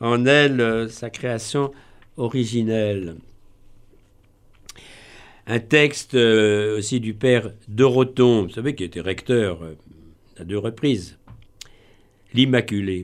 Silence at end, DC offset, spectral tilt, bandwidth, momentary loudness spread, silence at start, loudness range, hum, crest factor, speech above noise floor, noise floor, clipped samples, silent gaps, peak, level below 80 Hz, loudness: 0 s; under 0.1%; -5.5 dB/octave; 13.5 kHz; 14 LU; 0 s; 9 LU; none; 20 dB; 34 dB; -54 dBFS; under 0.1%; none; -2 dBFS; -52 dBFS; -20 LUFS